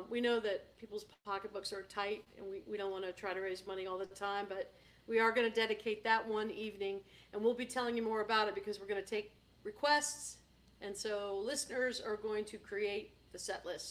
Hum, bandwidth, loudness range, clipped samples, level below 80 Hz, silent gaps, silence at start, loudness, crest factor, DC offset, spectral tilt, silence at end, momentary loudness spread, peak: none; 16 kHz; 6 LU; under 0.1%; -72 dBFS; none; 0 s; -38 LUFS; 22 dB; under 0.1%; -2.5 dB/octave; 0 s; 14 LU; -18 dBFS